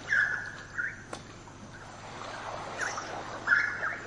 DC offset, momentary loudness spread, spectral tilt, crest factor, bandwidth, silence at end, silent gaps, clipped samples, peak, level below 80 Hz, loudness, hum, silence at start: under 0.1%; 20 LU; -2.5 dB/octave; 22 dB; 11.5 kHz; 0 s; none; under 0.1%; -12 dBFS; -60 dBFS; -31 LUFS; 50 Hz at -65 dBFS; 0 s